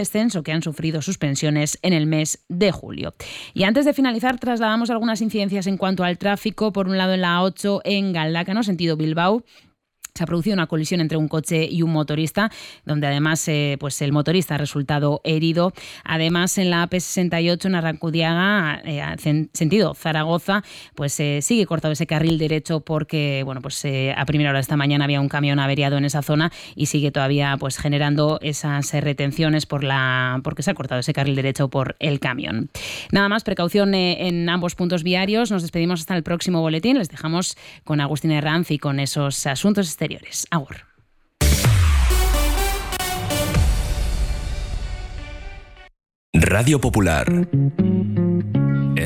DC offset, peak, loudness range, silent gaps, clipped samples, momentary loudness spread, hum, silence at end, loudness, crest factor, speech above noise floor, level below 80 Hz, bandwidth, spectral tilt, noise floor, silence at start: under 0.1%; -6 dBFS; 2 LU; 46.15-46.33 s; under 0.1%; 7 LU; none; 0 s; -21 LUFS; 14 dB; 38 dB; -32 dBFS; 16 kHz; -5 dB/octave; -59 dBFS; 0 s